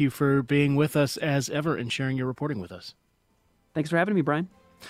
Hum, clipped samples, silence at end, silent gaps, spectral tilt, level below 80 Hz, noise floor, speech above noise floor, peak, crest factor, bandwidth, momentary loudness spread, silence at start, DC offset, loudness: none; under 0.1%; 0 s; none; -6 dB/octave; -60 dBFS; -68 dBFS; 43 dB; -8 dBFS; 18 dB; 16 kHz; 13 LU; 0 s; under 0.1%; -26 LUFS